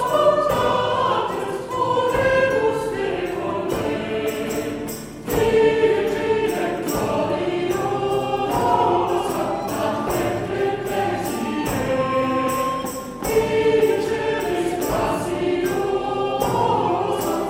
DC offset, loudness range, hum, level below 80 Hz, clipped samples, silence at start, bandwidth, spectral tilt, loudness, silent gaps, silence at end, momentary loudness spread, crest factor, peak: under 0.1%; 2 LU; none; -44 dBFS; under 0.1%; 0 s; 16.5 kHz; -5 dB/octave; -21 LUFS; none; 0 s; 7 LU; 16 dB; -4 dBFS